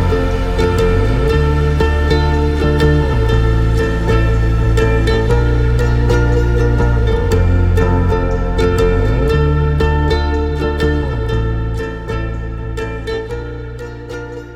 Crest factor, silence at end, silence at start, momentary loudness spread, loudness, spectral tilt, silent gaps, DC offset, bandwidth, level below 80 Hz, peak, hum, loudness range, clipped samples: 14 dB; 0 s; 0 s; 9 LU; -15 LUFS; -7.5 dB/octave; none; under 0.1%; 11 kHz; -16 dBFS; 0 dBFS; none; 5 LU; under 0.1%